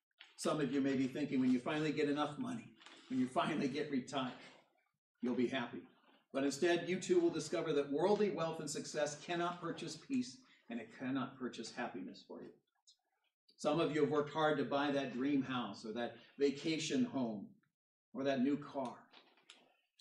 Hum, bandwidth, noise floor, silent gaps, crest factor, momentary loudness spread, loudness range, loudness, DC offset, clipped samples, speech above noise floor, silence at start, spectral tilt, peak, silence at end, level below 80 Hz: none; 12 kHz; -73 dBFS; 4.98-5.15 s, 12.82-12.87 s, 13.34-13.48 s, 17.74-18.12 s; 18 dB; 14 LU; 6 LU; -38 LUFS; under 0.1%; under 0.1%; 35 dB; 0.2 s; -5 dB/octave; -20 dBFS; 1 s; -84 dBFS